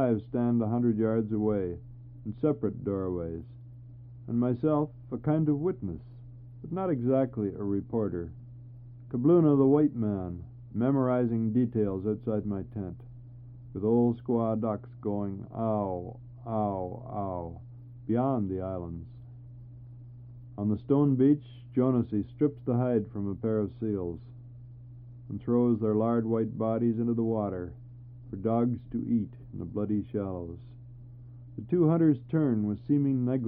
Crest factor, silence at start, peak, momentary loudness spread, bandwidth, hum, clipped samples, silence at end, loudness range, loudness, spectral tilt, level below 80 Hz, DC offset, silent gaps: 18 dB; 0 s; -12 dBFS; 22 LU; 3.7 kHz; none; under 0.1%; 0 s; 6 LU; -29 LUFS; -13.5 dB/octave; -56 dBFS; under 0.1%; none